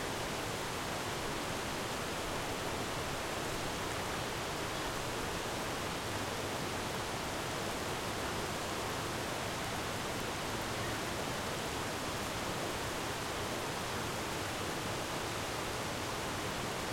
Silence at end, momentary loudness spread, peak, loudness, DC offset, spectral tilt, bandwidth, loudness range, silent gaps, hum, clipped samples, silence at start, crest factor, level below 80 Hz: 0 s; 0 LU; -24 dBFS; -37 LUFS; under 0.1%; -3.5 dB/octave; 16.5 kHz; 0 LU; none; none; under 0.1%; 0 s; 14 dB; -54 dBFS